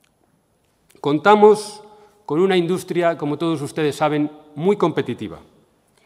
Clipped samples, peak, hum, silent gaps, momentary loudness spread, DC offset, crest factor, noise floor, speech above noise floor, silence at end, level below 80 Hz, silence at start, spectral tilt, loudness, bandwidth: under 0.1%; 0 dBFS; none; none; 14 LU; under 0.1%; 20 dB; -63 dBFS; 45 dB; 0.65 s; -64 dBFS; 1.05 s; -6 dB/octave; -19 LUFS; 14 kHz